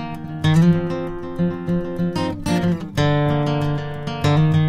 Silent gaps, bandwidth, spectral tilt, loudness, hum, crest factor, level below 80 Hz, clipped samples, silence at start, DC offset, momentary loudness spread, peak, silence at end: none; 12 kHz; -7.5 dB/octave; -20 LUFS; none; 14 dB; -40 dBFS; under 0.1%; 0 s; under 0.1%; 10 LU; -6 dBFS; 0 s